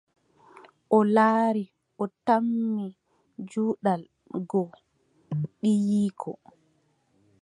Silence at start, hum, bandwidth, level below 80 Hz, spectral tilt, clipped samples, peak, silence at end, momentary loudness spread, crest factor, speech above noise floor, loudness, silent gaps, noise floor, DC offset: 0.9 s; none; 11 kHz; -76 dBFS; -8 dB/octave; under 0.1%; -8 dBFS; 1.1 s; 17 LU; 20 dB; 44 dB; -26 LUFS; none; -68 dBFS; under 0.1%